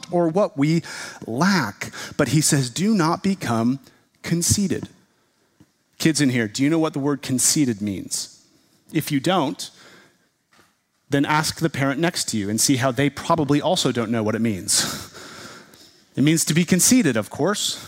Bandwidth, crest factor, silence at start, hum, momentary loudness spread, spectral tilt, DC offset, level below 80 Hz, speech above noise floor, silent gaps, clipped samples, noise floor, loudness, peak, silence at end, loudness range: 16 kHz; 18 dB; 0.1 s; none; 13 LU; -4 dB/octave; under 0.1%; -56 dBFS; 43 dB; none; under 0.1%; -64 dBFS; -21 LUFS; -4 dBFS; 0 s; 4 LU